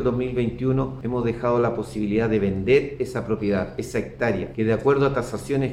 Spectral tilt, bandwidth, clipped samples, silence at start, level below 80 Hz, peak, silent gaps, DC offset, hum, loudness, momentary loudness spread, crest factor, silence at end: -7.5 dB/octave; 13.5 kHz; under 0.1%; 0 s; -44 dBFS; -8 dBFS; none; under 0.1%; none; -23 LUFS; 7 LU; 16 dB; 0 s